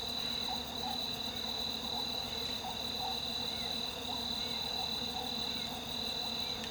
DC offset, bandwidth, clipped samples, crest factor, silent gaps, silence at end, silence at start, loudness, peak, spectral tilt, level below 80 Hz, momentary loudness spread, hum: under 0.1%; over 20 kHz; under 0.1%; 14 dB; none; 0 s; 0 s; -35 LUFS; -24 dBFS; -2.5 dB/octave; -58 dBFS; 2 LU; none